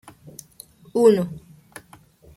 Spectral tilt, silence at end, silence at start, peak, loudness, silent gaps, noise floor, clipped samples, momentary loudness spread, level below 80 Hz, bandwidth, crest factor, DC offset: -6.5 dB/octave; 1 s; 0.95 s; -4 dBFS; -20 LUFS; none; -51 dBFS; under 0.1%; 26 LU; -60 dBFS; 15.5 kHz; 20 dB; under 0.1%